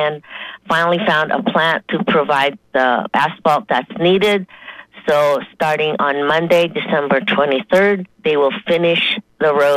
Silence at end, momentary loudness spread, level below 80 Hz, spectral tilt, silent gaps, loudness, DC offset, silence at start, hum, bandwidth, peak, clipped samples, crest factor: 0 s; 6 LU; -58 dBFS; -5.5 dB/octave; none; -16 LUFS; under 0.1%; 0 s; none; 15.5 kHz; -2 dBFS; under 0.1%; 14 dB